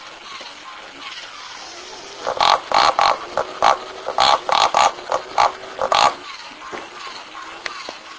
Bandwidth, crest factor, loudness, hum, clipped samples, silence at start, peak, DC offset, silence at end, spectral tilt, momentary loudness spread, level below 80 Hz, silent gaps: 8 kHz; 20 dB; -18 LUFS; none; under 0.1%; 0 s; 0 dBFS; under 0.1%; 0 s; -1 dB/octave; 18 LU; -54 dBFS; none